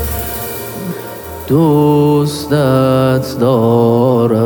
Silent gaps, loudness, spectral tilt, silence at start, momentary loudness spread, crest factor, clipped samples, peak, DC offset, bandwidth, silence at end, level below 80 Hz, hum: none; -12 LUFS; -7 dB/octave; 0 s; 13 LU; 12 dB; under 0.1%; 0 dBFS; under 0.1%; over 20 kHz; 0 s; -34 dBFS; none